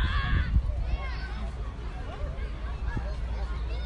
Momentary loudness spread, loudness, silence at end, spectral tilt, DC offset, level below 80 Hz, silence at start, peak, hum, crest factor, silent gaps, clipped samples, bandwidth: 10 LU; -33 LUFS; 0 s; -7 dB/octave; under 0.1%; -30 dBFS; 0 s; -12 dBFS; none; 16 dB; none; under 0.1%; 6.8 kHz